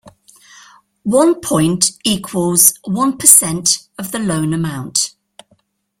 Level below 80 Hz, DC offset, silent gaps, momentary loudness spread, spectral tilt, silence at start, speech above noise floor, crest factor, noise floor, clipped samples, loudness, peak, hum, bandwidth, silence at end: -52 dBFS; under 0.1%; none; 13 LU; -3 dB/octave; 0.05 s; 44 dB; 16 dB; -59 dBFS; 0.2%; -13 LUFS; 0 dBFS; none; over 20 kHz; 0.9 s